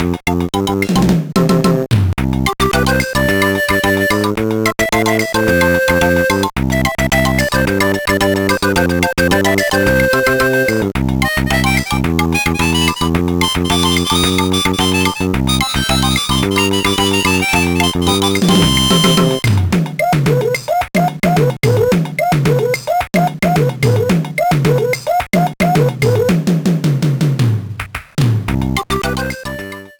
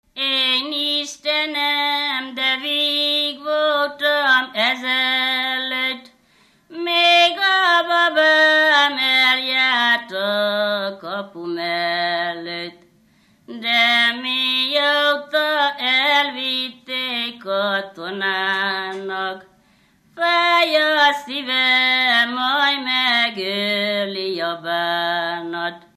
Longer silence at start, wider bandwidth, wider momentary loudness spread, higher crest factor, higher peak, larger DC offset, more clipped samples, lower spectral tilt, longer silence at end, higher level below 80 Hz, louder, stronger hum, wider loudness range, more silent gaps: second, 0 s vs 0.15 s; first, over 20 kHz vs 14 kHz; second, 4 LU vs 11 LU; about the same, 12 dB vs 16 dB; about the same, -2 dBFS vs -4 dBFS; neither; neither; first, -5 dB/octave vs -2.5 dB/octave; about the same, 0.1 s vs 0.2 s; first, -30 dBFS vs -74 dBFS; first, -14 LUFS vs -17 LUFS; neither; second, 2 LU vs 7 LU; neither